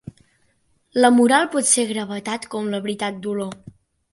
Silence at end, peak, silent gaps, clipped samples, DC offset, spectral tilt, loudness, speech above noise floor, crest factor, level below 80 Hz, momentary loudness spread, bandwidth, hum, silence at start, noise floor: 0.4 s; -4 dBFS; none; under 0.1%; under 0.1%; -3 dB/octave; -20 LUFS; 44 dB; 18 dB; -62 dBFS; 13 LU; 11.5 kHz; none; 0.95 s; -64 dBFS